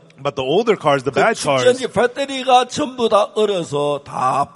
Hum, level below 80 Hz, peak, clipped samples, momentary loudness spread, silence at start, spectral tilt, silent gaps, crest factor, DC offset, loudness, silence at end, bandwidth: none; -58 dBFS; 0 dBFS; under 0.1%; 7 LU; 0.2 s; -4 dB/octave; none; 16 dB; under 0.1%; -17 LUFS; 0.1 s; 11.5 kHz